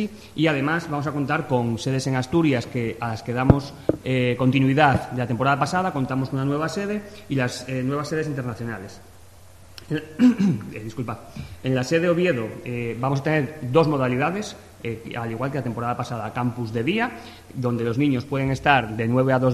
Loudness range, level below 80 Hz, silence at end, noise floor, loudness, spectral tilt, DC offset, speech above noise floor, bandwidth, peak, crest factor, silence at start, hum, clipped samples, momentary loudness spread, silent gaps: 5 LU; -48 dBFS; 0 s; -48 dBFS; -23 LUFS; -6.5 dB/octave; under 0.1%; 25 dB; 13 kHz; 0 dBFS; 22 dB; 0 s; none; under 0.1%; 12 LU; none